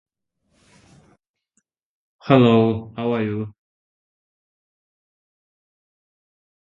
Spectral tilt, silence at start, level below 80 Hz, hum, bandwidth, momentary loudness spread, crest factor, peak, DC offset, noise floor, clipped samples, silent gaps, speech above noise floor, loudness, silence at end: -9 dB/octave; 2.25 s; -60 dBFS; none; 7.2 kHz; 18 LU; 24 dB; 0 dBFS; under 0.1%; -71 dBFS; under 0.1%; none; 54 dB; -19 LUFS; 3.15 s